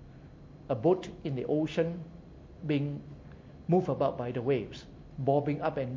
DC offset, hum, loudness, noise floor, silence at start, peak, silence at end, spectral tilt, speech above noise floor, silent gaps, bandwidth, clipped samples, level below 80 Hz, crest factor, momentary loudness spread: under 0.1%; none; -31 LUFS; -50 dBFS; 0 s; -14 dBFS; 0 s; -8.5 dB/octave; 20 dB; none; 7.6 kHz; under 0.1%; -56 dBFS; 18 dB; 22 LU